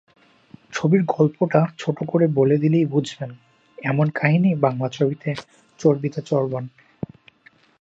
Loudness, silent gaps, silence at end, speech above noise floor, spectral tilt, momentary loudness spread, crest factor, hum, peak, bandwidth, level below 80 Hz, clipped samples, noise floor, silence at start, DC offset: -21 LUFS; none; 1.15 s; 35 dB; -8 dB/octave; 16 LU; 20 dB; none; -2 dBFS; 8 kHz; -64 dBFS; under 0.1%; -55 dBFS; 0.7 s; under 0.1%